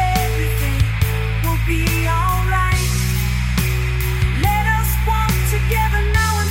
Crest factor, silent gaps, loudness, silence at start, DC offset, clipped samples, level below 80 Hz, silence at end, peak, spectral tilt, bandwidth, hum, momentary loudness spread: 16 dB; none; -18 LUFS; 0 s; under 0.1%; under 0.1%; -20 dBFS; 0 s; 0 dBFS; -4.5 dB/octave; 17 kHz; none; 2 LU